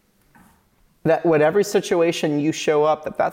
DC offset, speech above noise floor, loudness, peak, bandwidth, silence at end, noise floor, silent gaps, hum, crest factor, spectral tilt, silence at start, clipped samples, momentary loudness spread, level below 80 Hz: under 0.1%; 41 dB; -19 LUFS; -8 dBFS; 17 kHz; 0 s; -60 dBFS; none; none; 12 dB; -5 dB/octave; 1.05 s; under 0.1%; 5 LU; -62 dBFS